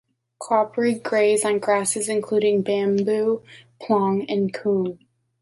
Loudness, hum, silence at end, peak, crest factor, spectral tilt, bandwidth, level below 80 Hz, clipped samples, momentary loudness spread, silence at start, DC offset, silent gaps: -22 LUFS; none; 0.45 s; -6 dBFS; 16 dB; -4.5 dB/octave; 11.5 kHz; -68 dBFS; under 0.1%; 5 LU; 0.4 s; under 0.1%; none